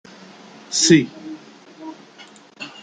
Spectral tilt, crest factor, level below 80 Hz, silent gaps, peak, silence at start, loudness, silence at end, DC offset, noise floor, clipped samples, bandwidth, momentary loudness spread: -3.5 dB/octave; 22 dB; -64 dBFS; none; -2 dBFS; 0.7 s; -16 LUFS; 0.15 s; under 0.1%; -45 dBFS; under 0.1%; 9.6 kHz; 25 LU